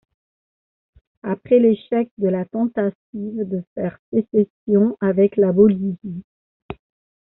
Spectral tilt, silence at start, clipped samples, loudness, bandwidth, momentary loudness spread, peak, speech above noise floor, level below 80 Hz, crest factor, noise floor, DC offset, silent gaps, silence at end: -9 dB/octave; 1.25 s; under 0.1%; -19 LUFS; 4.1 kHz; 18 LU; -2 dBFS; over 71 dB; -58 dBFS; 18 dB; under -90 dBFS; under 0.1%; 2.11-2.17 s, 2.95-3.13 s, 3.67-3.76 s, 3.99-4.12 s, 4.50-4.67 s, 6.24-6.69 s; 0.5 s